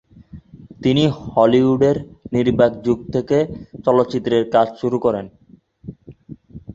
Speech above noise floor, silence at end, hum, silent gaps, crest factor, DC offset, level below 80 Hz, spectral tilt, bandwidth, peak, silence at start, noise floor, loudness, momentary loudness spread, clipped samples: 30 dB; 0 s; none; none; 18 dB; under 0.1%; -48 dBFS; -7.5 dB/octave; 7.8 kHz; -2 dBFS; 0.35 s; -47 dBFS; -18 LUFS; 23 LU; under 0.1%